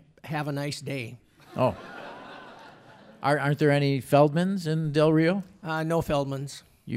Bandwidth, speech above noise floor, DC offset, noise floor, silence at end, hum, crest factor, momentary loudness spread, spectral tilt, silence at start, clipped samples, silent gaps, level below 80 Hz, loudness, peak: 15 kHz; 26 dB; under 0.1%; -51 dBFS; 0 s; none; 20 dB; 20 LU; -7 dB/octave; 0.25 s; under 0.1%; none; -58 dBFS; -26 LUFS; -8 dBFS